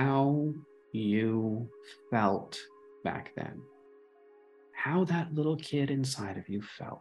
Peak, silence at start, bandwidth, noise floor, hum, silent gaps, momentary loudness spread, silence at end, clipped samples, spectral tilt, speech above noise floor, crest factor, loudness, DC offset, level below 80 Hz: -12 dBFS; 0 s; 12.5 kHz; -59 dBFS; none; none; 15 LU; 0 s; under 0.1%; -6.5 dB/octave; 27 dB; 20 dB; -32 LUFS; under 0.1%; -72 dBFS